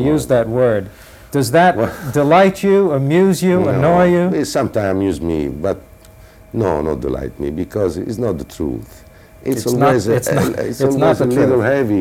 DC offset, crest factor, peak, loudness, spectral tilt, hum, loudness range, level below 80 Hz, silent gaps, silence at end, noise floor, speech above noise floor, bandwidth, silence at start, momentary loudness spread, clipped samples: under 0.1%; 14 dB; -2 dBFS; -16 LUFS; -6.5 dB/octave; none; 8 LU; -40 dBFS; none; 0 s; -41 dBFS; 27 dB; 16.5 kHz; 0 s; 11 LU; under 0.1%